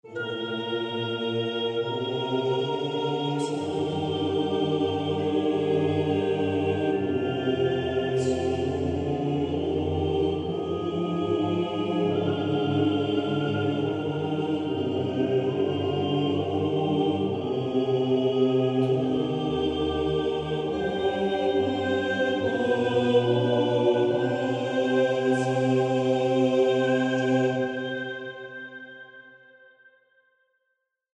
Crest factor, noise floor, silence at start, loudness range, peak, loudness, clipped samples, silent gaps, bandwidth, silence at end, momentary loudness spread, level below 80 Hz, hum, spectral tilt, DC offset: 16 dB; -78 dBFS; 0.05 s; 4 LU; -10 dBFS; -26 LUFS; under 0.1%; none; 9.6 kHz; 1.8 s; 6 LU; -54 dBFS; none; -7 dB/octave; under 0.1%